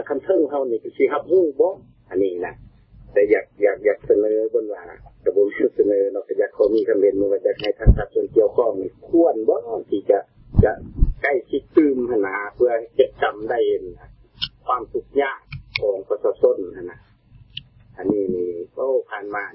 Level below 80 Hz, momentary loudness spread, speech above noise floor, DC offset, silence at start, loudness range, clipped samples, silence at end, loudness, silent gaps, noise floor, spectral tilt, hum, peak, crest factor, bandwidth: -32 dBFS; 11 LU; 30 dB; under 0.1%; 0 s; 5 LU; under 0.1%; 0 s; -21 LUFS; none; -50 dBFS; -11.5 dB/octave; none; -2 dBFS; 18 dB; 5.8 kHz